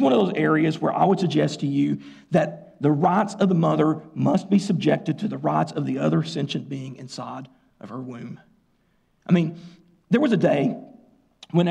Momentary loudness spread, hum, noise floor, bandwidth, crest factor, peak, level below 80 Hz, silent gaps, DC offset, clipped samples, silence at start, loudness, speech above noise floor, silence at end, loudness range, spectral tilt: 16 LU; none; -65 dBFS; 9.8 kHz; 14 dB; -8 dBFS; -66 dBFS; none; under 0.1%; under 0.1%; 0 s; -22 LUFS; 43 dB; 0 s; 8 LU; -7.5 dB/octave